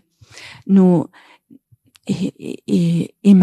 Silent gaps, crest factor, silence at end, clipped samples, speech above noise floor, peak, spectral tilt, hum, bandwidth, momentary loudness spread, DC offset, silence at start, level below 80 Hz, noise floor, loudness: none; 16 dB; 0 s; under 0.1%; 40 dB; -2 dBFS; -8.5 dB/octave; none; 10 kHz; 22 LU; under 0.1%; 0.35 s; -62 dBFS; -55 dBFS; -17 LUFS